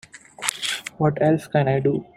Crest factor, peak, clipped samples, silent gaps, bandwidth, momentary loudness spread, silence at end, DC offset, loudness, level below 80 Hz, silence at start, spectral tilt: 22 dB; 0 dBFS; under 0.1%; none; 15.5 kHz; 7 LU; 0.15 s; under 0.1%; -22 LUFS; -60 dBFS; 0.15 s; -5 dB/octave